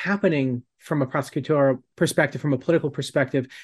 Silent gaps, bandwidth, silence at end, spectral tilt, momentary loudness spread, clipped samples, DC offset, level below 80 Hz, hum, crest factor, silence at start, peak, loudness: none; 12.5 kHz; 0 s; -6 dB/octave; 6 LU; under 0.1%; under 0.1%; -64 dBFS; none; 18 dB; 0 s; -6 dBFS; -23 LUFS